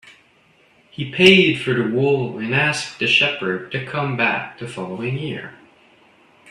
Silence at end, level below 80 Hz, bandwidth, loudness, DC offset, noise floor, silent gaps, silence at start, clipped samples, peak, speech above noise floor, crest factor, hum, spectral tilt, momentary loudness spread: 0.95 s; -58 dBFS; 12 kHz; -18 LUFS; under 0.1%; -56 dBFS; none; 0.05 s; under 0.1%; 0 dBFS; 37 dB; 20 dB; none; -5 dB/octave; 18 LU